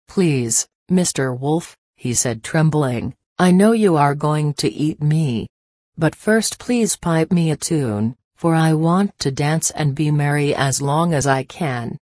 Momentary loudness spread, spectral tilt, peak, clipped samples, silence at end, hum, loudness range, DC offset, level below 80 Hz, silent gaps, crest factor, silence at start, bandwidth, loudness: 8 LU; -5.5 dB/octave; -2 dBFS; under 0.1%; 0.05 s; none; 2 LU; under 0.1%; -50 dBFS; 0.75-0.86 s, 1.78-1.93 s, 3.26-3.36 s, 5.50-5.92 s, 8.24-8.31 s; 16 dB; 0.1 s; 11 kHz; -18 LUFS